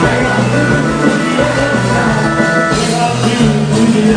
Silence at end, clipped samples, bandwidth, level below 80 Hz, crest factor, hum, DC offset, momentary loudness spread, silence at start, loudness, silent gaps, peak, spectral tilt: 0 s; under 0.1%; 10 kHz; -32 dBFS; 12 dB; none; under 0.1%; 1 LU; 0 s; -12 LUFS; none; 0 dBFS; -5.5 dB/octave